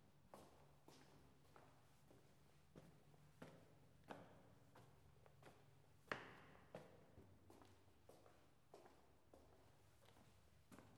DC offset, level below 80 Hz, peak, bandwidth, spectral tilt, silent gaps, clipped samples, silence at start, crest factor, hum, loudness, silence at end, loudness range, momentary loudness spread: under 0.1%; -84 dBFS; -28 dBFS; 15.5 kHz; -5 dB/octave; none; under 0.1%; 0 s; 38 dB; none; -63 LUFS; 0 s; 8 LU; 15 LU